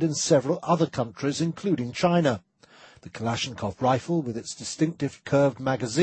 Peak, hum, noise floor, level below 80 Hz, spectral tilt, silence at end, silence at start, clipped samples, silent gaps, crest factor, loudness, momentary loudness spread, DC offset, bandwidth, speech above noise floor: -6 dBFS; none; -53 dBFS; -60 dBFS; -5.5 dB/octave; 0 s; 0 s; under 0.1%; none; 18 dB; -26 LUFS; 10 LU; under 0.1%; 8.8 kHz; 28 dB